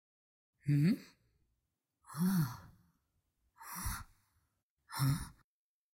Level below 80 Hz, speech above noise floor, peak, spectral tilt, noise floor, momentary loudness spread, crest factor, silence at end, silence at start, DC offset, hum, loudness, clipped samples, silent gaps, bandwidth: -58 dBFS; 53 dB; -22 dBFS; -6 dB/octave; -86 dBFS; 18 LU; 18 dB; 0.6 s; 0.65 s; under 0.1%; none; -36 LUFS; under 0.1%; 4.63-4.77 s; 16.5 kHz